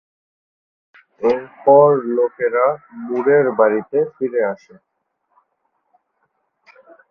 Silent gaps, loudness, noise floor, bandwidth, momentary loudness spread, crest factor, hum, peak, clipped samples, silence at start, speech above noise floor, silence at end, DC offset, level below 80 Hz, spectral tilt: none; -17 LUFS; -69 dBFS; 5.4 kHz; 11 LU; 18 dB; none; 0 dBFS; under 0.1%; 1.2 s; 53 dB; 2.55 s; under 0.1%; -66 dBFS; -9 dB/octave